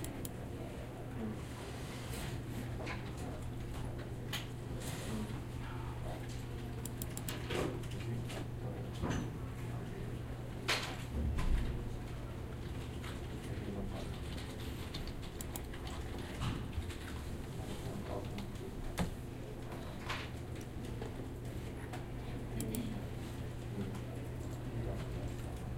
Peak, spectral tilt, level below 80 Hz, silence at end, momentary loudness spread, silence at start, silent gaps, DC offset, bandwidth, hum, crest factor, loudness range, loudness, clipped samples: -20 dBFS; -5.5 dB/octave; -46 dBFS; 0 s; 6 LU; 0 s; none; under 0.1%; 16 kHz; none; 20 dB; 3 LU; -43 LUFS; under 0.1%